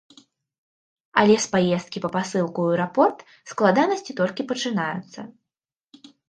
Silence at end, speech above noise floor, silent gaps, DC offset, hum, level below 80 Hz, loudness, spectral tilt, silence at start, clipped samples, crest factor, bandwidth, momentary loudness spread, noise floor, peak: 1 s; 66 dB; none; under 0.1%; none; -68 dBFS; -22 LUFS; -5 dB/octave; 1.15 s; under 0.1%; 22 dB; 9.6 kHz; 17 LU; -89 dBFS; -2 dBFS